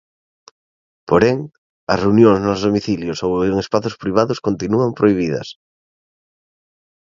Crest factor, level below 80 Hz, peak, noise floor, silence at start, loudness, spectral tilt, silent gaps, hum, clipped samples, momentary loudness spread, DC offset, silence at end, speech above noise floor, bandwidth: 18 dB; -46 dBFS; 0 dBFS; under -90 dBFS; 1.1 s; -17 LUFS; -7 dB/octave; 1.58-1.87 s; none; under 0.1%; 11 LU; under 0.1%; 1.65 s; over 74 dB; 7.6 kHz